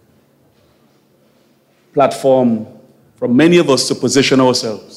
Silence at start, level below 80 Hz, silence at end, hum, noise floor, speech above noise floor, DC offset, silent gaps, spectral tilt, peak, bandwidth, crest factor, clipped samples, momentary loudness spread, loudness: 1.95 s; -58 dBFS; 0 s; none; -54 dBFS; 42 dB; under 0.1%; none; -4.5 dB/octave; 0 dBFS; 15 kHz; 16 dB; under 0.1%; 12 LU; -13 LUFS